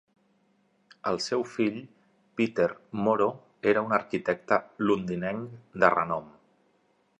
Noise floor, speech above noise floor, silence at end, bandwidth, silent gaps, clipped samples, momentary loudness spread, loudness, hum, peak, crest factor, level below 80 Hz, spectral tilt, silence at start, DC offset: -68 dBFS; 41 dB; 0.9 s; 10.5 kHz; none; under 0.1%; 10 LU; -28 LUFS; 50 Hz at -55 dBFS; -4 dBFS; 24 dB; -66 dBFS; -6 dB/octave; 1.05 s; under 0.1%